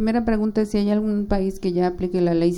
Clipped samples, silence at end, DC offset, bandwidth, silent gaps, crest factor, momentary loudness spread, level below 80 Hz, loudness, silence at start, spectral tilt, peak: under 0.1%; 0 s; under 0.1%; 12 kHz; none; 14 dB; 2 LU; -36 dBFS; -22 LUFS; 0 s; -8 dB/octave; -6 dBFS